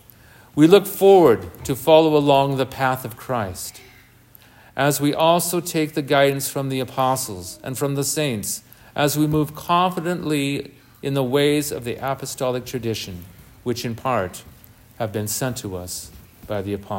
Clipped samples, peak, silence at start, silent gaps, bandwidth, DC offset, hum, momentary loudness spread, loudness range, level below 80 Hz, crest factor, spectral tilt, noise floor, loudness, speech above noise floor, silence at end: under 0.1%; 0 dBFS; 0.55 s; none; 16.5 kHz; under 0.1%; none; 16 LU; 10 LU; -54 dBFS; 20 dB; -5 dB/octave; -50 dBFS; -20 LUFS; 30 dB; 0 s